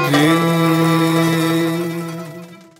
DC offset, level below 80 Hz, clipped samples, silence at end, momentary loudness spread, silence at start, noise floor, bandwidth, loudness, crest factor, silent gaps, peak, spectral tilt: under 0.1%; -60 dBFS; under 0.1%; 0.25 s; 16 LU; 0 s; -36 dBFS; 16.5 kHz; -16 LUFS; 14 dB; none; -2 dBFS; -5.5 dB/octave